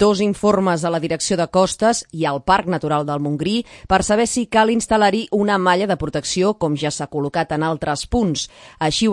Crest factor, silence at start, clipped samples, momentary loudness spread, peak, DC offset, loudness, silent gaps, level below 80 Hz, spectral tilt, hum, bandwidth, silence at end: 16 dB; 0 s; under 0.1%; 6 LU; -2 dBFS; under 0.1%; -19 LUFS; none; -42 dBFS; -4.5 dB/octave; none; 11.5 kHz; 0 s